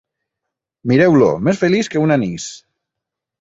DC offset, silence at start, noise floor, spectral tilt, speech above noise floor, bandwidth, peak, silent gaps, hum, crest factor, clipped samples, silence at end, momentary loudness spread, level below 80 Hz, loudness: under 0.1%; 0.85 s; -82 dBFS; -6.5 dB/octave; 68 dB; 8 kHz; -2 dBFS; none; none; 16 dB; under 0.1%; 0.85 s; 15 LU; -52 dBFS; -15 LUFS